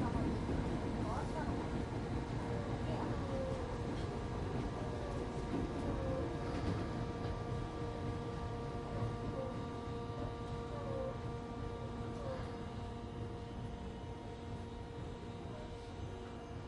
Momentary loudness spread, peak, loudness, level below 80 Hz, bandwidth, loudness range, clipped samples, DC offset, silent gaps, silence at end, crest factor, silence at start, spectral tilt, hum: 8 LU; -26 dBFS; -42 LUFS; -48 dBFS; 11.5 kHz; 6 LU; under 0.1%; under 0.1%; none; 0 s; 16 dB; 0 s; -7.5 dB/octave; none